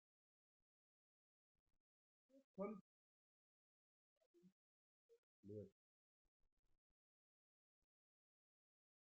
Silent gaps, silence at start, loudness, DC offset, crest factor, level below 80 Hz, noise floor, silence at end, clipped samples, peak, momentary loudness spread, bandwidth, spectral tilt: 2.44-2.54 s, 2.81-4.34 s, 4.52-5.09 s, 5.18-5.43 s; 2.35 s; -57 LUFS; under 0.1%; 26 dB; under -90 dBFS; under -90 dBFS; 3.35 s; under 0.1%; -38 dBFS; 13 LU; 1.3 kHz; -3.5 dB/octave